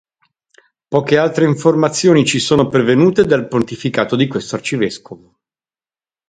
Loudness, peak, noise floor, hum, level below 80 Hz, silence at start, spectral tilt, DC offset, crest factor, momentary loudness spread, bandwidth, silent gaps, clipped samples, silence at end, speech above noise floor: -14 LUFS; 0 dBFS; under -90 dBFS; none; -50 dBFS; 0.9 s; -5.5 dB/octave; under 0.1%; 16 dB; 8 LU; 9.6 kHz; none; under 0.1%; 1.15 s; over 76 dB